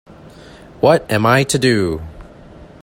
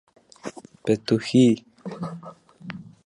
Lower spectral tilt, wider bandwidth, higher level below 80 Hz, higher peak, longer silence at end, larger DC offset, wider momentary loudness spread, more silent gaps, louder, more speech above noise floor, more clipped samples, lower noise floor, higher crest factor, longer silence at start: second, -5 dB/octave vs -6.5 dB/octave; first, 16.5 kHz vs 11 kHz; first, -44 dBFS vs -64 dBFS; first, 0 dBFS vs -6 dBFS; about the same, 0.2 s vs 0.25 s; neither; second, 11 LU vs 22 LU; neither; first, -15 LUFS vs -23 LUFS; first, 25 dB vs 18 dB; neither; about the same, -40 dBFS vs -40 dBFS; about the same, 18 dB vs 18 dB; second, 0.1 s vs 0.45 s